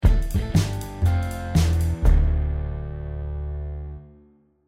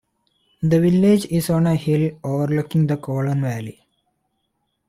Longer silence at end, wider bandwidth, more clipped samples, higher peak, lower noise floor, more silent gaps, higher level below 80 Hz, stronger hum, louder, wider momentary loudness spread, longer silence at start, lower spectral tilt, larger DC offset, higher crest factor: second, 0.6 s vs 1.2 s; about the same, 15.5 kHz vs 15.5 kHz; neither; about the same, -6 dBFS vs -6 dBFS; second, -56 dBFS vs -72 dBFS; neither; first, -24 dBFS vs -52 dBFS; neither; second, -25 LUFS vs -19 LUFS; first, 12 LU vs 9 LU; second, 0 s vs 0.6 s; about the same, -6.5 dB/octave vs -7.5 dB/octave; neither; about the same, 16 dB vs 14 dB